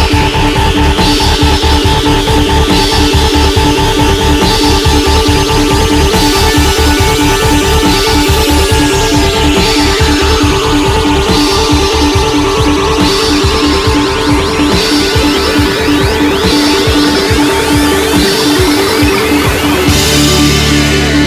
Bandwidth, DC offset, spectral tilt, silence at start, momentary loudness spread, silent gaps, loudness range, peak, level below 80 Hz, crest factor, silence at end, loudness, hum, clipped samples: 16 kHz; 0.2%; -4.5 dB/octave; 0 s; 2 LU; none; 1 LU; 0 dBFS; -16 dBFS; 8 dB; 0 s; -8 LUFS; none; 0.4%